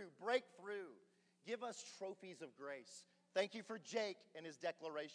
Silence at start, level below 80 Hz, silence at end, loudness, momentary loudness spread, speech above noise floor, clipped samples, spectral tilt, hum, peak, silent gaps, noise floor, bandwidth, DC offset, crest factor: 0 s; under -90 dBFS; 0 s; -47 LUFS; 14 LU; 26 dB; under 0.1%; -3 dB/octave; none; -26 dBFS; none; -74 dBFS; 10.5 kHz; under 0.1%; 22 dB